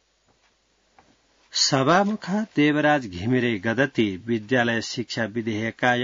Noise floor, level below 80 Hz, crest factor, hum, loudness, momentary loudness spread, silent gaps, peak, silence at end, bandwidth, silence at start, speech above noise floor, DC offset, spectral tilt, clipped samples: -65 dBFS; -64 dBFS; 18 dB; none; -23 LUFS; 8 LU; none; -6 dBFS; 0 s; 7.6 kHz; 1.55 s; 43 dB; under 0.1%; -4.5 dB/octave; under 0.1%